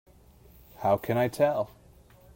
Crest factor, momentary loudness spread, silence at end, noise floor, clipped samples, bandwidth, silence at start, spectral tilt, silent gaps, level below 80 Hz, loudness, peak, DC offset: 18 dB; 8 LU; 0.7 s; -56 dBFS; under 0.1%; 16.5 kHz; 0.8 s; -6.5 dB/octave; none; -58 dBFS; -28 LUFS; -12 dBFS; under 0.1%